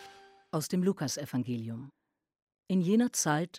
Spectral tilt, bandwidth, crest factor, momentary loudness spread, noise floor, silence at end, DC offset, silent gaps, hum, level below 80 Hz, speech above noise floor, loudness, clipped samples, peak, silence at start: -5 dB/octave; 16 kHz; 18 dB; 11 LU; -55 dBFS; 0 s; under 0.1%; 2.42-2.47 s; none; -76 dBFS; 25 dB; -31 LUFS; under 0.1%; -14 dBFS; 0 s